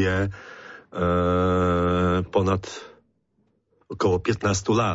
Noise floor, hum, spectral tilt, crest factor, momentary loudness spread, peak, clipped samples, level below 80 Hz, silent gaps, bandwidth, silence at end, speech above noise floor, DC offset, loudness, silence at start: -69 dBFS; none; -6 dB/octave; 14 dB; 19 LU; -10 dBFS; under 0.1%; -46 dBFS; none; 8 kHz; 0 s; 46 dB; under 0.1%; -23 LUFS; 0 s